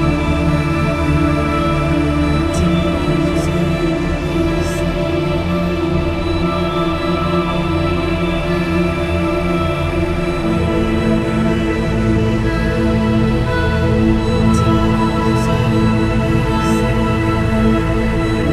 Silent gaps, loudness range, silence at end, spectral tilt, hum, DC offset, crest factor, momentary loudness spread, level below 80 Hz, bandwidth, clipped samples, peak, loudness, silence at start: none; 2 LU; 0 s; -7 dB/octave; none; under 0.1%; 14 dB; 3 LU; -24 dBFS; 14 kHz; under 0.1%; 0 dBFS; -16 LUFS; 0 s